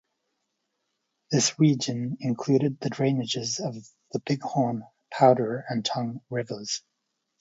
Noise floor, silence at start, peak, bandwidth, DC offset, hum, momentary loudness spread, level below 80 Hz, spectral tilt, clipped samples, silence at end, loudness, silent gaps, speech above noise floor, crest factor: -79 dBFS; 1.3 s; -4 dBFS; 8 kHz; under 0.1%; none; 13 LU; -70 dBFS; -5 dB/octave; under 0.1%; 0.6 s; -26 LUFS; none; 54 dB; 22 dB